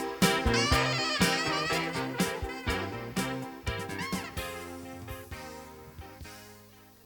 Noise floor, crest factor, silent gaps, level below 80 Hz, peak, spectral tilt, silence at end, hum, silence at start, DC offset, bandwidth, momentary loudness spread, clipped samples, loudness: -55 dBFS; 24 dB; none; -44 dBFS; -8 dBFS; -4 dB/octave; 0.15 s; none; 0 s; under 0.1%; over 20 kHz; 20 LU; under 0.1%; -30 LUFS